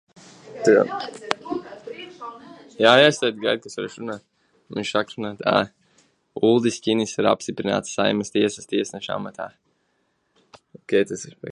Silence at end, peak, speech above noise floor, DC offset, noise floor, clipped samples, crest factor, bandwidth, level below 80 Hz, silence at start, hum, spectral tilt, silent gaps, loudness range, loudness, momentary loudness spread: 0 s; 0 dBFS; 48 dB; under 0.1%; -69 dBFS; under 0.1%; 24 dB; 11.5 kHz; -64 dBFS; 0.45 s; none; -4 dB/octave; none; 6 LU; -22 LUFS; 19 LU